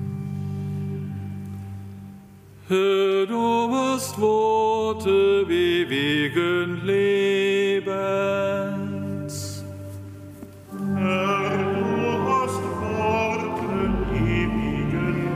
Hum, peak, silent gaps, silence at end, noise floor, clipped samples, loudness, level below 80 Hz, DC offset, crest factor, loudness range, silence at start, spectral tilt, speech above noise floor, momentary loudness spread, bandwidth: none; -10 dBFS; none; 0 s; -46 dBFS; under 0.1%; -23 LUFS; -42 dBFS; under 0.1%; 14 dB; 6 LU; 0 s; -6 dB/octave; 25 dB; 15 LU; 15.5 kHz